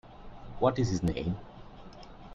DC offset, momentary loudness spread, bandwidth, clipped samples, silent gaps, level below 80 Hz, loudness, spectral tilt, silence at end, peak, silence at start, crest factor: under 0.1%; 22 LU; 10.5 kHz; under 0.1%; none; -48 dBFS; -31 LUFS; -7 dB/octave; 0 s; -12 dBFS; 0.05 s; 22 dB